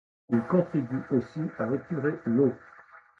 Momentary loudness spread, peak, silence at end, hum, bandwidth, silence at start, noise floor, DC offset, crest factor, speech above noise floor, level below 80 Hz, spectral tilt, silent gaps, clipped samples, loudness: 6 LU; -10 dBFS; 0.25 s; none; 6.2 kHz; 0.3 s; -53 dBFS; under 0.1%; 18 dB; 26 dB; -66 dBFS; -10.5 dB/octave; none; under 0.1%; -28 LUFS